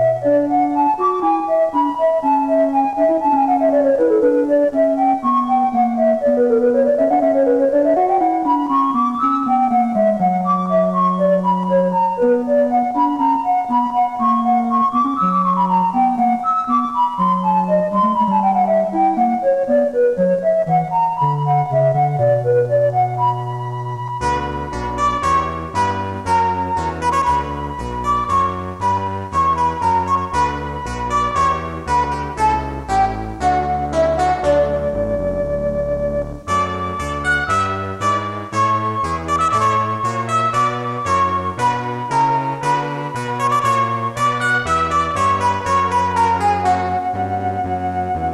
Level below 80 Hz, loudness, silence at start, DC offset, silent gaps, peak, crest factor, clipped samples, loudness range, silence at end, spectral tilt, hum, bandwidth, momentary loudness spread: -38 dBFS; -17 LUFS; 0 s; under 0.1%; none; -6 dBFS; 10 dB; under 0.1%; 4 LU; 0 s; -6.5 dB/octave; none; 12.5 kHz; 6 LU